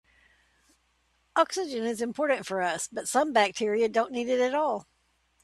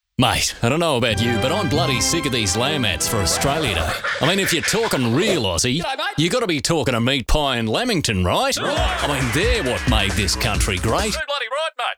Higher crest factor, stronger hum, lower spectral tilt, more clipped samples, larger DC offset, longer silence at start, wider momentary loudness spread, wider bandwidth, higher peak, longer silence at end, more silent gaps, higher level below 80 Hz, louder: first, 22 dB vs 16 dB; neither; about the same, -3 dB/octave vs -3.5 dB/octave; neither; neither; first, 1.35 s vs 0.2 s; first, 7 LU vs 3 LU; second, 15 kHz vs over 20 kHz; second, -8 dBFS vs -4 dBFS; first, 0.6 s vs 0.05 s; neither; second, -72 dBFS vs -32 dBFS; second, -27 LUFS vs -19 LUFS